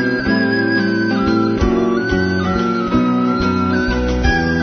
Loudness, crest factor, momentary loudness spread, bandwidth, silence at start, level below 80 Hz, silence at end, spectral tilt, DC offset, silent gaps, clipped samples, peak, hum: -16 LUFS; 14 dB; 2 LU; 6.6 kHz; 0 s; -28 dBFS; 0 s; -7 dB/octave; under 0.1%; none; under 0.1%; -2 dBFS; none